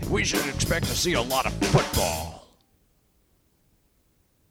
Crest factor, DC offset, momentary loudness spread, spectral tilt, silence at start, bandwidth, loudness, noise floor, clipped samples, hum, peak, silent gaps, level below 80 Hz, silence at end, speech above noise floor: 20 dB; under 0.1%; 5 LU; -4 dB/octave; 0 s; 18.5 kHz; -24 LUFS; -66 dBFS; under 0.1%; none; -6 dBFS; none; -40 dBFS; 2.1 s; 41 dB